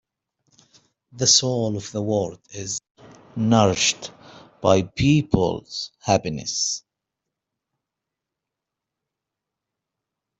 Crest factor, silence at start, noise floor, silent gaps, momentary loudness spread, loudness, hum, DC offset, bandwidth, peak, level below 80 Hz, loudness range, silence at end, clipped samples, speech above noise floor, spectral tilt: 22 dB; 1.15 s; -85 dBFS; 2.91-2.95 s; 15 LU; -21 LUFS; none; under 0.1%; 8.2 kHz; -2 dBFS; -50 dBFS; 7 LU; 3.6 s; under 0.1%; 64 dB; -4 dB/octave